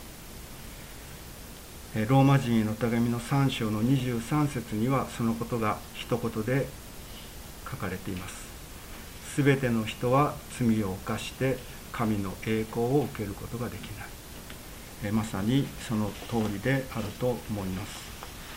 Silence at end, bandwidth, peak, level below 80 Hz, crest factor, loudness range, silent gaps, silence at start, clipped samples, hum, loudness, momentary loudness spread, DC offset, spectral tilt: 0 s; 16 kHz; -10 dBFS; -48 dBFS; 20 dB; 6 LU; none; 0 s; under 0.1%; none; -29 LUFS; 18 LU; under 0.1%; -6 dB/octave